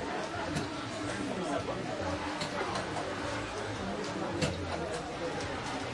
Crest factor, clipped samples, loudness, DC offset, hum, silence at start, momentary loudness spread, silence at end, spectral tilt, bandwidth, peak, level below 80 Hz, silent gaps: 18 dB; under 0.1%; -35 LUFS; under 0.1%; none; 0 s; 3 LU; 0 s; -4.5 dB/octave; 11.5 kHz; -18 dBFS; -56 dBFS; none